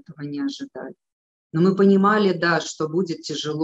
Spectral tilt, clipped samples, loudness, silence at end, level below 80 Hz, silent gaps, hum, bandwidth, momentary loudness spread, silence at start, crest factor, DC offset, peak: -6 dB/octave; under 0.1%; -21 LUFS; 0 s; -70 dBFS; 1.12-1.50 s; none; 8 kHz; 18 LU; 0.1 s; 16 dB; under 0.1%; -6 dBFS